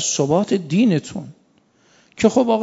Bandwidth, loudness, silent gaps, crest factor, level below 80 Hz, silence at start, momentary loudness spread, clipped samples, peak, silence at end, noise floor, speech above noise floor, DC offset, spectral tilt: 8 kHz; -18 LUFS; none; 18 dB; -56 dBFS; 0 s; 11 LU; under 0.1%; -2 dBFS; 0 s; -58 dBFS; 40 dB; under 0.1%; -5 dB/octave